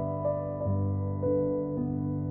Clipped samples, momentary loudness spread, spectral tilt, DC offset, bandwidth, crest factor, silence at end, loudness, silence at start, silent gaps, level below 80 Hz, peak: under 0.1%; 3 LU; -14 dB/octave; under 0.1%; 2.1 kHz; 14 dB; 0 s; -30 LUFS; 0 s; none; -54 dBFS; -16 dBFS